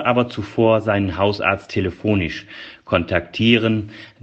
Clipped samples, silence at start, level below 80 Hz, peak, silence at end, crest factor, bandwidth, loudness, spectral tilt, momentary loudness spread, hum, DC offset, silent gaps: under 0.1%; 0 s; -46 dBFS; 0 dBFS; 0.15 s; 18 dB; 7.8 kHz; -19 LUFS; -7 dB/octave; 11 LU; none; under 0.1%; none